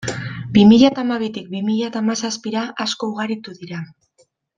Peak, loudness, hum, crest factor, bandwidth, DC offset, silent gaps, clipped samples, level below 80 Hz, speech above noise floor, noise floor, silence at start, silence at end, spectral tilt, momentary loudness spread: -2 dBFS; -18 LUFS; none; 16 dB; 9.2 kHz; under 0.1%; none; under 0.1%; -54 dBFS; 43 dB; -60 dBFS; 0 s; 0.75 s; -5.5 dB/octave; 20 LU